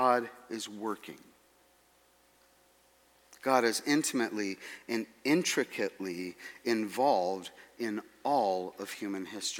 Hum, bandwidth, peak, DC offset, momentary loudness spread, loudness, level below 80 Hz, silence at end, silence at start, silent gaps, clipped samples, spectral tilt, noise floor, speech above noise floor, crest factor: none; 18 kHz; -12 dBFS; under 0.1%; 12 LU; -32 LUFS; -80 dBFS; 0 s; 0 s; none; under 0.1%; -3.5 dB/octave; -66 dBFS; 34 dB; 22 dB